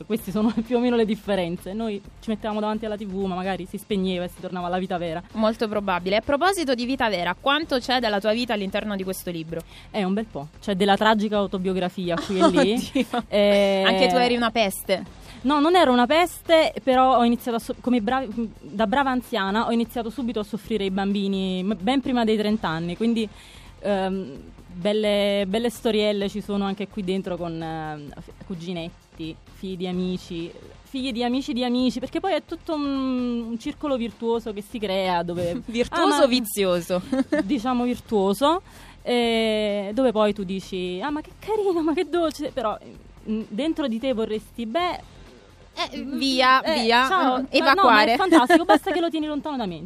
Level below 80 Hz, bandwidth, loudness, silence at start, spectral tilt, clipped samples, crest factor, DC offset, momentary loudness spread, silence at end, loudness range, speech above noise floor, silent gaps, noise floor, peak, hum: -50 dBFS; 15.5 kHz; -23 LUFS; 0 s; -5 dB/octave; under 0.1%; 22 dB; under 0.1%; 13 LU; 0 s; 8 LU; 26 dB; none; -48 dBFS; -2 dBFS; none